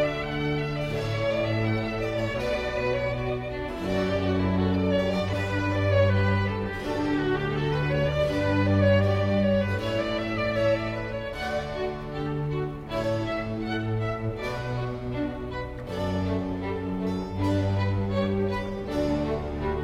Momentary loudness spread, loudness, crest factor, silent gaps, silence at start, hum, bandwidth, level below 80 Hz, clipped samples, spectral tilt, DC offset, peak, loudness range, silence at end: 8 LU; -27 LUFS; 16 dB; none; 0 s; none; 11 kHz; -42 dBFS; under 0.1%; -7.5 dB/octave; under 0.1%; -10 dBFS; 6 LU; 0 s